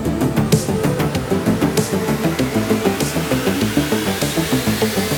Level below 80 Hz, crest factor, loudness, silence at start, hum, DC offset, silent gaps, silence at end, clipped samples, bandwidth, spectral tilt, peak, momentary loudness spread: -36 dBFS; 18 dB; -18 LUFS; 0 s; none; under 0.1%; none; 0 s; under 0.1%; over 20 kHz; -5 dB/octave; 0 dBFS; 2 LU